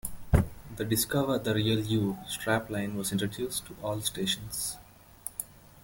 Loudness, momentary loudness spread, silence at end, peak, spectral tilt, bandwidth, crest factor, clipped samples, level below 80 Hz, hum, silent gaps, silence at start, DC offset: -31 LUFS; 10 LU; 0.25 s; -6 dBFS; -4.5 dB/octave; 17 kHz; 24 dB; under 0.1%; -44 dBFS; none; none; 0.05 s; under 0.1%